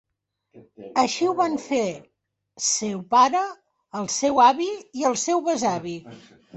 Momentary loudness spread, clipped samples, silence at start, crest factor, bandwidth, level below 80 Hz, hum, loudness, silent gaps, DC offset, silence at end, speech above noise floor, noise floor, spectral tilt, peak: 14 LU; under 0.1%; 0.55 s; 18 dB; 8.4 kHz; -66 dBFS; none; -22 LUFS; none; under 0.1%; 0 s; 55 dB; -78 dBFS; -3 dB/octave; -6 dBFS